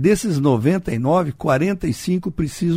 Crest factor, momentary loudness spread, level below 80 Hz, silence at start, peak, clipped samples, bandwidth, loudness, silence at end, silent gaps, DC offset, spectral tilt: 16 dB; 5 LU; -42 dBFS; 0 s; -4 dBFS; under 0.1%; 16 kHz; -19 LUFS; 0 s; none; under 0.1%; -7 dB/octave